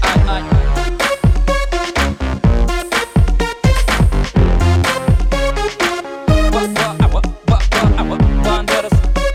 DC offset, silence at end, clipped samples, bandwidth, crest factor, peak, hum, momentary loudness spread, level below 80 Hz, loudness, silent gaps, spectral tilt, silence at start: under 0.1%; 0 s; under 0.1%; 15 kHz; 10 dB; -4 dBFS; none; 4 LU; -16 dBFS; -15 LUFS; none; -5.5 dB/octave; 0 s